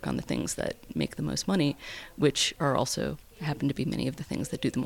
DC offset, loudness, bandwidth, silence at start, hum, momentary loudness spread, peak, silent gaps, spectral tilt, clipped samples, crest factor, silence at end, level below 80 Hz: under 0.1%; -30 LUFS; 18 kHz; 0 s; none; 9 LU; -12 dBFS; none; -4.5 dB/octave; under 0.1%; 18 dB; 0 s; -52 dBFS